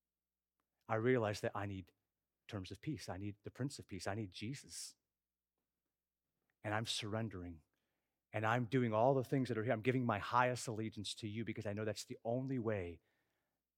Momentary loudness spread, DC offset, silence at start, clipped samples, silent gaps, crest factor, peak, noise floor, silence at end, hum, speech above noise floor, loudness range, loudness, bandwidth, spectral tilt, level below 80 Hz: 14 LU; under 0.1%; 0.9 s; under 0.1%; none; 22 dB; -18 dBFS; under -90 dBFS; 0.8 s; none; over 50 dB; 10 LU; -40 LUFS; 16 kHz; -5.5 dB/octave; -74 dBFS